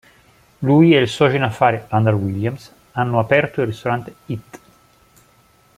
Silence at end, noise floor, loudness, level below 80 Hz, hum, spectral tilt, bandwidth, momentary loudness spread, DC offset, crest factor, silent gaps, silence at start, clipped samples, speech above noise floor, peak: 1.2 s; -54 dBFS; -17 LUFS; -54 dBFS; none; -7 dB/octave; 14.5 kHz; 17 LU; under 0.1%; 18 dB; none; 0.6 s; under 0.1%; 37 dB; -2 dBFS